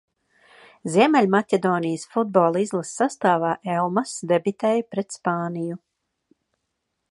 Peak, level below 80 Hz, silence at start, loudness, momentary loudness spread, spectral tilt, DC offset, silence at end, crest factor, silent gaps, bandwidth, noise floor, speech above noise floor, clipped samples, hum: -2 dBFS; -72 dBFS; 0.85 s; -22 LUFS; 10 LU; -5.5 dB/octave; under 0.1%; 1.35 s; 20 dB; none; 11.5 kHz; -78 dBFS; 56 dB; under 0.1%; none